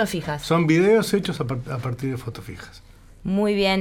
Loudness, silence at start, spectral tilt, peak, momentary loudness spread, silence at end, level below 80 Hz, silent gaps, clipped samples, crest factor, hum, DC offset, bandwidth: -22 LUFS; 0 s; -6 dB/octave; -6 dBFS; 19 LU; 0 s; -48 dBFS; none; under 0.1%; 16 dB; none; under 0.1%; 18 kHz